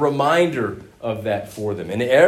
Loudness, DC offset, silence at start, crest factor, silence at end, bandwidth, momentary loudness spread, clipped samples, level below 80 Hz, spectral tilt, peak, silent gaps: -22 LUFS; under 0.1%; 0 s; 18 dB; 0 s; 15 kHz; 11 LU; under 0.1%; -56 dBFS; -6 dB/octave; -2 dBFS; none